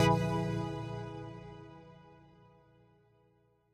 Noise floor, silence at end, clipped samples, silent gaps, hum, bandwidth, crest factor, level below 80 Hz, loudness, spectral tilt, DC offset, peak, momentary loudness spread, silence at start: -70 dBFS; 1.6 s; under 0.1%; none; none; 15 kHz; 22 dB; -58 dBFS; -36 LUFS; -6.5 dB/octave; under 0.1%; -14 dBFS; 25 LU; 0 s